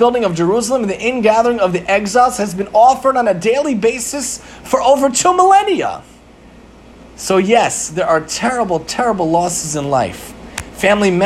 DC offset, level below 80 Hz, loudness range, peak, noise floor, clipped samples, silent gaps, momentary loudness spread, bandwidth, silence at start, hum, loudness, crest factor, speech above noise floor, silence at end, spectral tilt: under 0.1%; -44 dBFS; 3 LU; 0 dBFS; -41 dBFS; under 0.1%; none; 10 LU; 15.5 kHz; 0 s; none; -14 LUFS; 14 dB; 27 dB; 0 s; -4 dB/octave